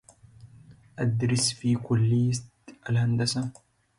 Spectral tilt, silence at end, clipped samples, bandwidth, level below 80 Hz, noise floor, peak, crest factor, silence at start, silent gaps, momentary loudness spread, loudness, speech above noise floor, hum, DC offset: -5 dB/octave; 0.5 s; under 0.1%; 11.5 kHz; -58 dBFS; -53 dBFS; -12 dBFS; 14 dB; 0.45 s; none; 11 LU; -26 LUFS; 28 dB; none; under 0.1%